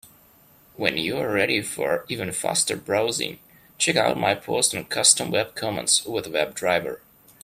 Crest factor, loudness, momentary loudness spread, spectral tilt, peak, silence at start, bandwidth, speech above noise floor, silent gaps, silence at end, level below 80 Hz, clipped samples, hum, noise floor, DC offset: 22 dB; -22 LUFS; 8 LU; -2 dB/octave; -2 dBFS; 0.8 s; 16 kHz; 31 dB; none; 0.45 s; -62 dBFS; under 0.1%; none; -55 dBFS; under 0.1%